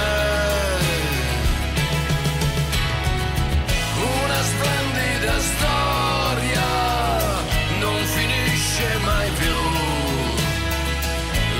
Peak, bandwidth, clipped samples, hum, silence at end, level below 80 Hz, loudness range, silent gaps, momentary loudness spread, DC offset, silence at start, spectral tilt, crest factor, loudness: -10 dBFS; 16.5 kHz; under 0.1%; none; 0 s; -28 dBFS; 1 LU; none; 3 LU; under 0.1%; 0 s; -4 dB/octave; 12 dB; -21 LUFS